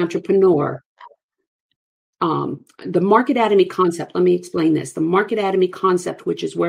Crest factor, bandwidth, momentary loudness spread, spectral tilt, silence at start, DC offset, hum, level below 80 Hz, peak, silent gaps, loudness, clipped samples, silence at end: 18 dB; 12 kHz; 9 LU; -6.5 dB/octave; 0 s; under 0.1%; none; -66 dBFS; 0 dBFS; 0.86-0.96 s, 1.23-1.29 s, 1.47-1.69 s, 1.76-2.13 s; -18 LUFS; under 0.1%; 0 s